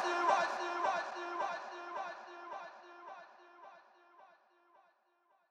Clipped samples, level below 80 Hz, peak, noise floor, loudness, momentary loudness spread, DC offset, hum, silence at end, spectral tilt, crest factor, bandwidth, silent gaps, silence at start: under 0.1%; under -90 dBFS; -18 dBFS; -75 dBFS; -38 LUFS; 25 LU; under 0.1%; none; 1.2 s; -2 dB/octave; 22 dB; 11 kHz; none; 0 s